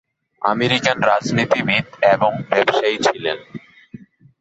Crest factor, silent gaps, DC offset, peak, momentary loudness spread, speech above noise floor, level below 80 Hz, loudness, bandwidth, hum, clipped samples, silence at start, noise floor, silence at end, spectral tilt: 18 dB; none; under 0.1%; -2 dBFS; 9 LU; 24 dB; -58 dBFS; -17 LUFS; 8.2 kHz; none; under 0.1%; 0.4 s; -41 dBFS; 0.45 s; -4.5 dB/octave